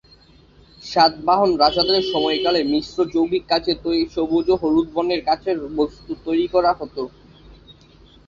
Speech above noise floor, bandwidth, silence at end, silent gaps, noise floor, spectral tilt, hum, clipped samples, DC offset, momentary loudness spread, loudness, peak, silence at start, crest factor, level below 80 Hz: 31 dB; 7.4 kHz; 0.55 s; none; -50 dBFS; -5.5 dB/octave; none; under 0.1%; under 0.1%; 8 LU; -19 LUFS; -2 dBFS; 0.85 s; 18 dB; -48 dBFS